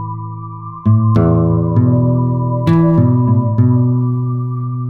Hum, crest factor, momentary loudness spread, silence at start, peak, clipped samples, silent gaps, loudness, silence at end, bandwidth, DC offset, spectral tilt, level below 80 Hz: none; 12 dB; 11 LU; 0 s; -2 dBFS; under 0.1%; none; -13 LUFS; 0 s; 4.3 kHz; under 0.1%; -11.5 dB/octave; -36 dBFS